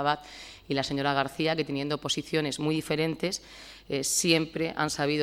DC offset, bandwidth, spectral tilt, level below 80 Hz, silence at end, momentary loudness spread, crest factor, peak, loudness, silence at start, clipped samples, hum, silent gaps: under 0.1%; 16.5 kHz; -3.5 dB/octave; -58 dBFS; 0 s; 10 LU; 20 dB; -8 dBFS; -28 LUFS; 0 s; under 0.1%; none; none